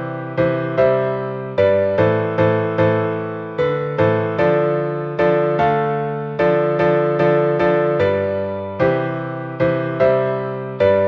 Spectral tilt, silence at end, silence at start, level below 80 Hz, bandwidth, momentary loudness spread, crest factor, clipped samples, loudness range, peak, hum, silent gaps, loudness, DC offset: -9 dB/octave; 0 s; 0 s; -50 dBFS; 6.2 kHz; 7 LU; 14 dB; under 0.1%; 1 LU; -2 dBFS; none; none; -18 LUFS; under 0.1%